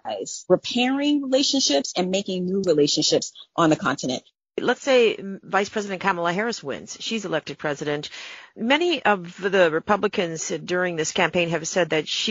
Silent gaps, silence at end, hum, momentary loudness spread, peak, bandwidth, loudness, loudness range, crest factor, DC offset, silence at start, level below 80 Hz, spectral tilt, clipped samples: none; 0 s; none; 11 LU; -4 dBFS; 8 kHz; -23 LUFS; 4 LU; 20 dB; under 0.1%; 0.05 s; -64 dBFS; -2.5 dB/octave; under 0.1%